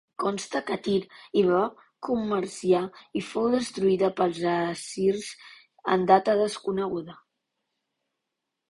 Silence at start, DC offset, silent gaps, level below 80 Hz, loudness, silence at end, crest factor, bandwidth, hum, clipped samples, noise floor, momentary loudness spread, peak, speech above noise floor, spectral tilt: 0.2 s; under 0.1%; none; -66 dBFS; -26 LUFS; 1.55 s; 22 dB; 11.5 kHz; none; under 0.1%; -84 dBFS; 12 LU; -6 dBFS; 58 dB; -5.5 dB/octave